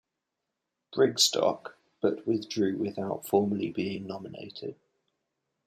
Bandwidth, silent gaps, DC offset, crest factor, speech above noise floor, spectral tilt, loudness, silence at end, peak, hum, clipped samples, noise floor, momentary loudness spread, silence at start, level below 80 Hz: 16 kHz; none; under 0.1%; 20 dB; 56 dB; -4 dB/octave; -28 LUFS; 0.95 s; -10 dBFS; none; under 0.1%; -85 dBFS; 17 LU; 0.9 s; -74 dBFS